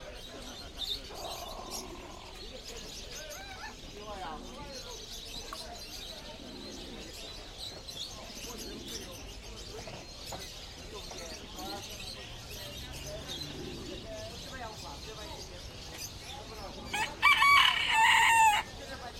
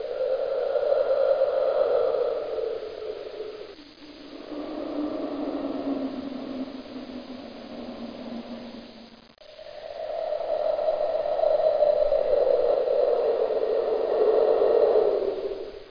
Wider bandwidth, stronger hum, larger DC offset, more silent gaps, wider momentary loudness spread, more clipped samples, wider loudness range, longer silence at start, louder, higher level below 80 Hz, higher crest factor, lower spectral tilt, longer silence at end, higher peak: first, 16.5 kHz vs 5.2 kHz; neither; neither; neither; first, 21 LU vs 18 LU; neither; about the same, 16 LU vs 14 LU; about the same, 0 s vs 0 s; second, -31 LUFS vs -25 LUFS; about the same, -52 dBFS vs -56 dBFS; first, 24 dB vs 16 dB; second, -1.5 dB/octave vs -6.5 dB/octave; about the same, 0 s vs 0 s; about the same, -10 dBFS vs -10 dBFS